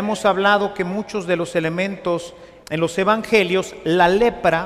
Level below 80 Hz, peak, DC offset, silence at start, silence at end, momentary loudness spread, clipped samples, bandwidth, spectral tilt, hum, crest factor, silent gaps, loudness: -48 dBFS; -2 dBFS; under 0.1%; 0 s; 0 s; 9 LU; under 0.1%; 15 kHz; -5 dB/octave; none; 16 dB; none; -19 LUFS